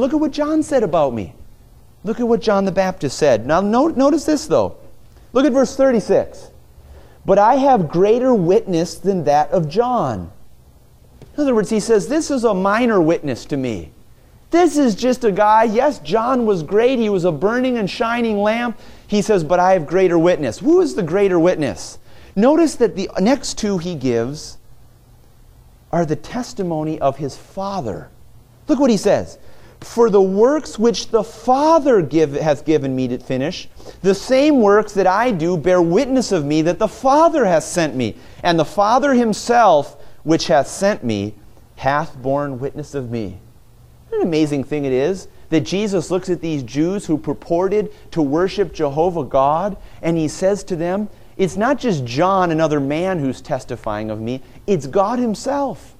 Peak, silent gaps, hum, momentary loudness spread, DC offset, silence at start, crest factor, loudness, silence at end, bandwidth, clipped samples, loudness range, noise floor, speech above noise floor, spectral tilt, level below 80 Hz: -2 dBFS; none; none; 12 LU; under 0.1%; 0 s; 16 dB; -17 LUFS; 0.15 s; 15 kHz; under 0.1%; 6 LU; -47 dBFS; 30 dB; -6 dB/octave; -44 dBFS